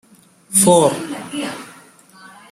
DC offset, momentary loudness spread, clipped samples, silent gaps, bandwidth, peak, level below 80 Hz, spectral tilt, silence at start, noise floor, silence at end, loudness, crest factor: under 0.1%; 16 LU; under 0.1%; none; 16 kHz; 0 dBFS; -60 dBFS; -4 dB/octave; 0.5 s; -47 dBFS; 0.25 s; -16 LUFS; 18 dB